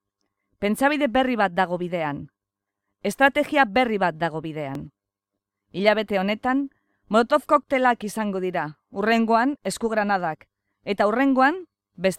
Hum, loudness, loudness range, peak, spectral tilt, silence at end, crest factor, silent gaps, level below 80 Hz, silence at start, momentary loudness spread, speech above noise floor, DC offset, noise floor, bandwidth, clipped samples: none; -23 LUFS; 2 LU; -4 dBFS; -5 dB/octave; 0 s; 20 dB; none; -58 dBFS; 0.6 s; 12 LU; 63 dB; under 0.1%; -85 dBFS; 15.5 kHz; under 0.1%